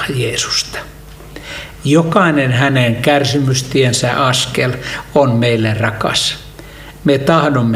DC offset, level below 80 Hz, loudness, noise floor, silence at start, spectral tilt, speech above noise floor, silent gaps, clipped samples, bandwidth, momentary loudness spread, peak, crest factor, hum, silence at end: under 0.1%; -40 dBFS; -14 LUFS; -33 dBFS; 0 s; -4.5 dB/octave; 20 dB; none; under 0.1%; 16 kHz; 16 LU; 0 dBFS; 14 dB; none; 0 s